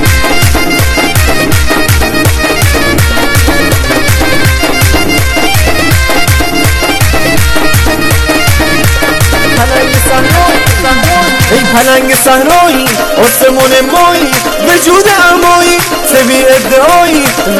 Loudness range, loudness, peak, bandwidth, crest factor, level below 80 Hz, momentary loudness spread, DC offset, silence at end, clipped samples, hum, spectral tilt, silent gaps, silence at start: 2 LU; -6 LUFS; 0 dBFS; over 20 kHz; 6 dB; -16 dBFS; 3 LU; under 0.1%; 0 s; 3%; none; -4 dB/octave; none; 0 s